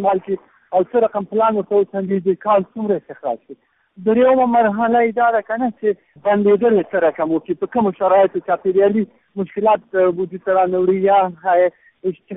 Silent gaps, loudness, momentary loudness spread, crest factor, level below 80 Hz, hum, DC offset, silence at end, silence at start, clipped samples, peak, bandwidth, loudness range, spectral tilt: none; -17 LUFS; 10 LU; 14 dB; -60 dBFS; none; under 0.1%; 0 s; 0 s; under 0.1%; -4 dBFS; 3.9 kHz; 3 LU; -2.5 dB/octave